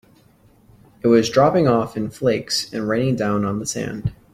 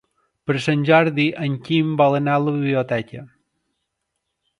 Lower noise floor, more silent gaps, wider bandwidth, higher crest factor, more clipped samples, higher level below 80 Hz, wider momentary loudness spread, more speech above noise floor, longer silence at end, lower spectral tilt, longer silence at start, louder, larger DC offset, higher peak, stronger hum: second, -54 dBFS vs -77 dBFS; neither; first, 15.5 kHz vs 11 kHz; about the same, 18 dB vs 20 dB; neither; first, -48 dBFS vs -62 dBFS; about the same, 10 LU vs 10 LU; second, 35 dB vs 58 dB; second, 0.2 s vs 1.35 s; second, -5.5 dB/octave vs -7 dB/octave; first, 1.05 s vs 0.45 s; about the same, -20 LUFS vs -19 LUFS; neither; about the same, -2 dBFS vs 0 dBFS; neither